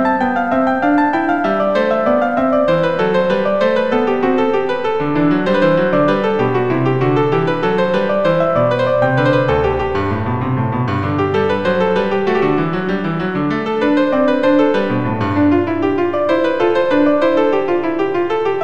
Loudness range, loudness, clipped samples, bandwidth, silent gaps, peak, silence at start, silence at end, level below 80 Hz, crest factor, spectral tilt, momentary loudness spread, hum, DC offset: 2 LU; -15 LUFS; under 0.1%; 8.2 kHz; none; -2 dBFS; 0 s; 0 s; -42 dBFS; 12 dB; -8 dB/octave; 4 LU; none; 2%